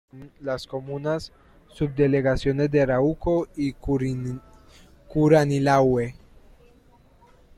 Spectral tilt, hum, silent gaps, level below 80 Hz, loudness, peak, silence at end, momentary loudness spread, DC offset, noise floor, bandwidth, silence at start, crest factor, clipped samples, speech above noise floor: -7.5 dB/octave; none; none; -44 dBFS; -23 LUFS; -6 dBFS; 1.45 s; 13 LU; under 0.1%; -55 dBFS; 12.5 kHz; 0.15 s; 18 dB; under 0.1%; 33 dB